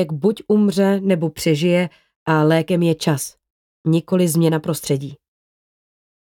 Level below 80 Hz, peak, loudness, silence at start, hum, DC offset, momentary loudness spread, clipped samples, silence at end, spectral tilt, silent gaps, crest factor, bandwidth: -58 dBFS; -4 dBFS; -18 LUFS; 0 s; none; under 0.1%; 9 LU; under 0.1%; 1.2 s; -6 dB/octave; 2.16-2.26 s, 3.50-3.84 s; 14 dB; 17.5 kHz